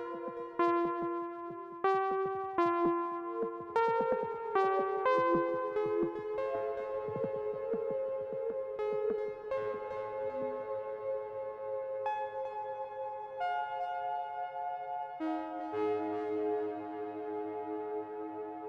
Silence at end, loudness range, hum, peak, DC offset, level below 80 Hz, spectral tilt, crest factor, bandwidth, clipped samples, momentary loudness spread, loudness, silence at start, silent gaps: 0 s; 6 LU; none; -18 dBFS; under 0.1%; -72 dBFS; -7.5 dB/octave; 18 dB; 7 kHz; under 0.1%; 10 LU; -35 LUFS; 0 s; none